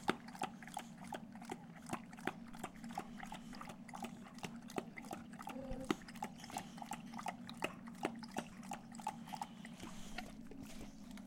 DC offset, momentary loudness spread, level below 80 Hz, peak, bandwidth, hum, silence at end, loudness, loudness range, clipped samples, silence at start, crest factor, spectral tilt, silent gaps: under 0.1%; 7 LU; -64 dBFS; -16 dBFS; 16.5 kHz; none; 0 s; -48 LUFS; 3 LU; under 0.1%; 0 s; 32 dB; -4.5 dB/octave; none